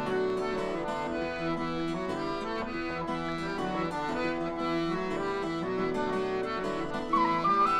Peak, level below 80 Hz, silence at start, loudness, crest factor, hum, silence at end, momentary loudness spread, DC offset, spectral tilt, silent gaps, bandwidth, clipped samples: -16 dBFS; -52 dBFS; 0 s; -31 LUFS; 14 dB; none; 0 s; 6 LU; under 0.1%; -6 dB/octave; none; 11.5 kHz; under 0.1%